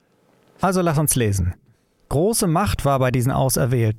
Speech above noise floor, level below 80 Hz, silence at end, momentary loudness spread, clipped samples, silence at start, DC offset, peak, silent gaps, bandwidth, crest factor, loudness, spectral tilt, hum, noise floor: 40 dB; -38 dBFS; 0 s; 6 LU; under 0.1%; 0.6 s; under 0.1%; -6 dBFS; none; 16.5 kHz; 14 dB; -20 LUFS; -5.5 dB/octave; none; -59 dBFS